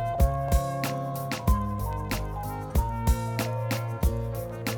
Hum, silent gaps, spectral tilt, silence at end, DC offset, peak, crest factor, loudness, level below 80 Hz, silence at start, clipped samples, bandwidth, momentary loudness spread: none; none; -6 dB/octave; 0 s; under 0.1%; -10 dBFS; 16 dB; -29 LUFS; -30 dBFS; 0 s; under 0.1%; over 20 kHz; 6 LU